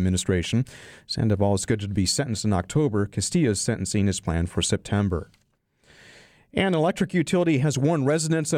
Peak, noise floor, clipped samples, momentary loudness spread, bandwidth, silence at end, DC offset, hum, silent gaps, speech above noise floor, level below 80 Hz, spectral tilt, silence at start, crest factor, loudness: -8 dBFS; -66 dBFS; under 0.1%; 5 LU; 15.5 kHz; 0 s; under 0.1%; none; none; 43 dB; -46 dBFS; -5 dB/octave; 0 s; 16 dB; -24 LUFS